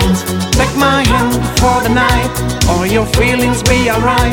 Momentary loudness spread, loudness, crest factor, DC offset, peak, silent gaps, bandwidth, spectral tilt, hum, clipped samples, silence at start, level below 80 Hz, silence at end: 3 LU; -12 LUFS; 12 dB; under 0.1%; 0 dBFS; none; 18 kHz; -4.5 dB/octave; none; under 0.1%; 0 s; -22 dBFS; 0 s